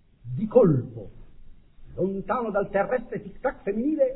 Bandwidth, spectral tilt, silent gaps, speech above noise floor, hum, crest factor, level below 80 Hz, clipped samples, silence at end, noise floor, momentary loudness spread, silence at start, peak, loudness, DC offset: 4.1 kHz; -13 dB/octave; none; 21 dB; none; 20 dB; -48 dBFS; under 0.1%; 0 s; -46 dBFS; 18 LU; 0.25 s; -6 dBFS; -25 LUFS; under 0.1%